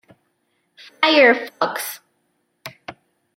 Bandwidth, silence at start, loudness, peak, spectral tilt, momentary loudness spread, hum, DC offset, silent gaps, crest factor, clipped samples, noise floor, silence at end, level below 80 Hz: 16.5 kHz; 1 s; -17 LUFS; -2 dBFS; -2.5 dB/octave; 26 LU; none; under 0.1%; none; 20 dB; under 0.1%; -69 dBFS; 0.45 s; -72 dBFS